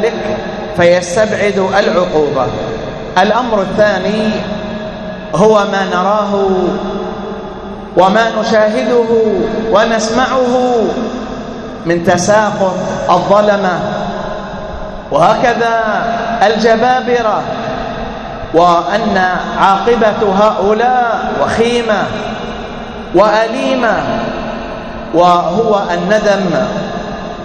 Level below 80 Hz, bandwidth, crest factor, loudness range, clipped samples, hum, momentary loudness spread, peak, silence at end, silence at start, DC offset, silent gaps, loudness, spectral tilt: -36 dBFS; 10.5 kHz; 12 dB; 2 LU; 0.2%; none; 12 LU; 0 dBFS; 0 s; 0 s; under 0.1%; none; -12 LUFS; -5 dB/octave